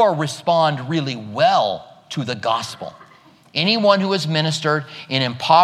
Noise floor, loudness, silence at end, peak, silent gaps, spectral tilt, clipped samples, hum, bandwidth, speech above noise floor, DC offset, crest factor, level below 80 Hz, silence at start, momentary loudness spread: -49 dBFS; -19 LUFS; 0 s; -2 dBFS; none; -5 dB/octave; under 0.1%; none; 14 kHz; 31 dB; under 0.1%; 18 dB; -68 dBFS; 0 s; 12 LU